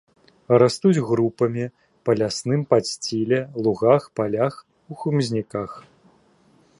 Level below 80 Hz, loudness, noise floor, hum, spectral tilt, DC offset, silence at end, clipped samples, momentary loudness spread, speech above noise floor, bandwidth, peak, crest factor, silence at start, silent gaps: -60 dBFS; -22 LUFS; -58 dBFS; none; -6 dB/octave; under 0.1%; 1 s; under 0.1%; 13 LU; 37 dB; 11.5 kHz; -2 dBFS; 20 dB; 0.5 s; none